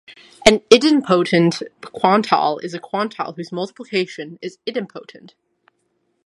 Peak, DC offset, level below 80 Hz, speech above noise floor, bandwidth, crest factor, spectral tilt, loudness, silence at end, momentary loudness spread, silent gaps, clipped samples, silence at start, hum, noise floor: 0 dBFS; under 0.1%; -52 dBFS; 50 dB; 12 kHz; 20 dB; -4.5 dB/octave; -18 LUFS; 1.25 s; 17 LU; none; under 0.1%; 0.1 s; none; -68 dBFS